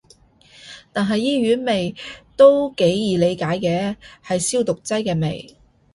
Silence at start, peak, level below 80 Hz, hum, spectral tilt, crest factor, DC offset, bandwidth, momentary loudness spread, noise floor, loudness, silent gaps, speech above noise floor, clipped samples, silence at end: 0.65 s; -2 dBFS; -54 dBFS; none; -5 dB/octave; 18 dB; under 0.1%; 11.5 kHz; 20 LU; -52 dBFS; -19 LUFS; none; 34 dB; under 0.1%; 0.5 s